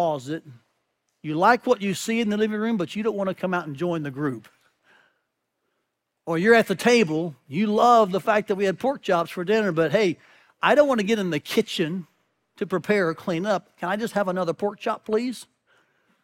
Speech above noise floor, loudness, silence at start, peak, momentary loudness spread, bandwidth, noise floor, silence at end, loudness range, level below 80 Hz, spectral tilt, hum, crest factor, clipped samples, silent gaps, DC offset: 55 dB; -23 LUFS; 0 s; -4 dBFS; 12 LU; 16.5 kHz; -78 dBFS; 0.8 s; 7 LU; -68 dBFS; -5.5 dB/octave; none; 20 dB; under 0.1%; none; under 0.1%